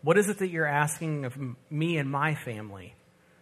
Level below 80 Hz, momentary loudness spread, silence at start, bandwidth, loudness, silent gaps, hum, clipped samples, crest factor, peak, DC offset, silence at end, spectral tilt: -72 dBFS; 14 LU; 0.05 s; 14 kHz; -29 LUFS; none; none; under 0.1%; 20 dB; -8 dBFS; under 0.1%; 0.5 s; -5.5 dB/octave